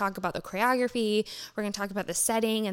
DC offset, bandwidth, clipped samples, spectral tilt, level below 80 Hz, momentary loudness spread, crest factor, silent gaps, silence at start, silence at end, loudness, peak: under 0.1%; 17 kHz; under 0.1%; -3 dB/octave; -62 dBFS; 8 LU; 16 dB; none; 0 s; 0 s; -28 LUFS; -12 dBFS